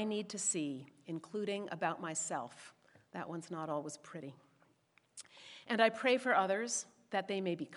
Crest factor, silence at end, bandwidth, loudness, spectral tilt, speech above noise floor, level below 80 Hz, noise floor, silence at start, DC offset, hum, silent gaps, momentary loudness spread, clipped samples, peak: 24 dB; 0 s; 11.5 kHz; -37 LUFS; -3 dB/octave; 35 dB; under -90 dBFS; -73 dBFS; 0 s; under 0.1%; none; none; 21 LU; under 0.1%; -14 dBFS